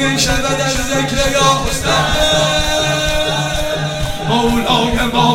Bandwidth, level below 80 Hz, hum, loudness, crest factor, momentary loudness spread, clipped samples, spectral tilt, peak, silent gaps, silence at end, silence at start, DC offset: 17 kHz; -26 dBFS; none; -14 LUFS; 14 dB; 5 LU; under 0.1%; -3.5 dB/octave; 0 dBFS; none; 0 s; 0 s; under 0.1%